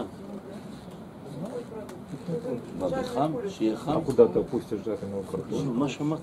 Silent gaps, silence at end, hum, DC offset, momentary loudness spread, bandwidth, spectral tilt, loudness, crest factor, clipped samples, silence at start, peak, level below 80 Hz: none; 0 s; none; under 0.1%; 19 LU; 14 kHz; -7 dB/octave; -29 LUFS; 24 dB; under 0.1%; 0 s; -4 dBFS; -58 dBFS